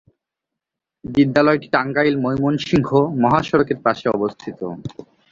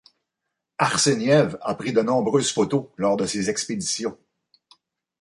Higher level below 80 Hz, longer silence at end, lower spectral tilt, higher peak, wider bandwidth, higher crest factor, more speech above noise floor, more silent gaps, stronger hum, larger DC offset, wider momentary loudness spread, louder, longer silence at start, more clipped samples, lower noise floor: first, -50 dBFS vs -60 dBFS; second, 0.3 s vs 1.05 s; first, -7.5 dB/octave vs -4 dB/octave; first, -2 dBFS vs -6 dBFS; second, 7.4 kHz vs 11.5 kHz; about the same, 18 dB vs 18 dB; first, 66 dB vs 60 dB; neither; neither; neither; first, 13 LU vs 8 LU; first, -18 LUFS vs -22 LUFS; first, 1.05 s vs 0.8 s; neither; about the same, -84 dBFS vs -82 dBFS